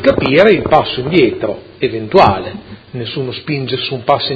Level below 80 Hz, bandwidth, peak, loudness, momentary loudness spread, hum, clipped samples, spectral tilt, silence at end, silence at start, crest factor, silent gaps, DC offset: -40 dBFS; 8 kHz; 0 dBFS; -13 LUFS; 14 LU; none; 0.3%; -7.5 dB/octave; 0 s; 0 s; 14 dB; none; under 0.1%